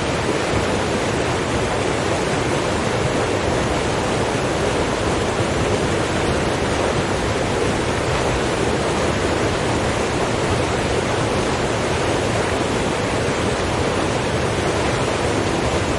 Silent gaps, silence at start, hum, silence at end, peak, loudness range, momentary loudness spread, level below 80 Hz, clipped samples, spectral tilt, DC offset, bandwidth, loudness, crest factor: none; 0 s; none; 0 s; -6 dBFS; 0 LU; 1 LU; -34 dBFS; under 0.1%; -4.5 dB/octave; under 0.1%; 11.5 kHz; -20 LUFS; 14 dB